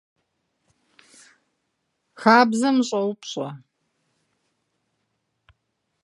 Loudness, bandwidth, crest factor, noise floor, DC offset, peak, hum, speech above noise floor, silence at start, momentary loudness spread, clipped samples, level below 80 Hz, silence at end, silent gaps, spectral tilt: -20 LUFS; 11.5 kHz; 24 dB; -76 dBFS; under 0.1%; -2 dBFS; none; 56 dB; 2.2 s; 16 LU; under 0.1%; -76 dBFS; 2.45 s; none; -4.5 dB/octave